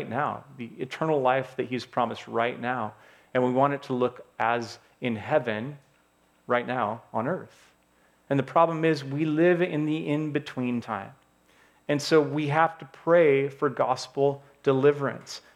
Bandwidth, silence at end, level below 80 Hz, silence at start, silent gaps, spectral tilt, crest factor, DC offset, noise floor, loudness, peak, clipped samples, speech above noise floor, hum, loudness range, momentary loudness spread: 13.5 kHz; 0.15 s; -74 dBFS; 0 s; none; -6.5 dB/octave; 20 dB; under 0.1%; -64 dBFS; -26 LUFS; -6 dBFS; under 0.1%; 38 dB; none; 5 LU; 12 LU